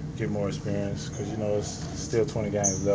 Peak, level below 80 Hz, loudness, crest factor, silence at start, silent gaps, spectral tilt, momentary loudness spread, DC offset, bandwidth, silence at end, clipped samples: -12 dBFS; -46 dBFS; -29 LUFS; 18 dB; 0 s; none; -5 dB/octave; 8 LU; under 0.1%; 8 kHz; 0 s; under 0.1%